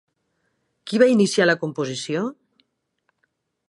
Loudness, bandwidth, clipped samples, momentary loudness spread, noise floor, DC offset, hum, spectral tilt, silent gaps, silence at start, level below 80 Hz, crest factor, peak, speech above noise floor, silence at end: -20 LUFS; 11.5 kHz; under 0.1%; 12 LU; -72 dBFS; under 0.1%; none; -5 dB/octave; none; 0.85 s; -74 dBFS; 20 dB; -2 dBFS; 53 dB; 1.35 s